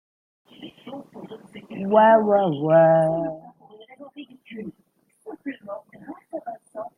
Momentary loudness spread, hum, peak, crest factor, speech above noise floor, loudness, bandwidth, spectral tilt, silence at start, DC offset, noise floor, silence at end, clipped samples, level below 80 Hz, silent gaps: 26 LU; none; -4 dBFS; 20 dB; 30 dB; -18 LUFS; 10 kHz; -8.5 dB/octave; 0.6 s; under 0.1%; -49 dBFS; 0.1 s; under 0.1%; -70 dBFS; none